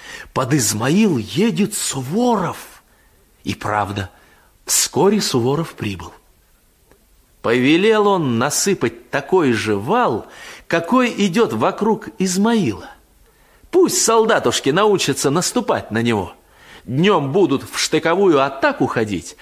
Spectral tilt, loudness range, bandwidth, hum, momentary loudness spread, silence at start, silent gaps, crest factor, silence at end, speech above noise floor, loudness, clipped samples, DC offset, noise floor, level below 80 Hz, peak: -4 dB/octave; 3 LU; 16 kHz; none; 12 LU; 0 s; none; 16 dB; 0.1 s; 38 dB; -17 LUFS; under 0.1%; under 0.1%; -55 dBFS; -50 dBFS; -2 dBFS